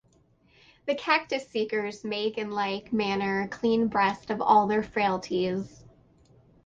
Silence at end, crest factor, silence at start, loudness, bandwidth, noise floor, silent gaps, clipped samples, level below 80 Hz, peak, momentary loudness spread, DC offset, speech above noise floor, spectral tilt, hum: 1 s; 20 dB; 0.85 s; -27 LUFS; 7.8 kHz; -63 dBFS; none; under 0.1%; -62 dBFS; -8 dBFS; 9 LU; under 0.1%; 37 dB; -5.5 dB/octave; none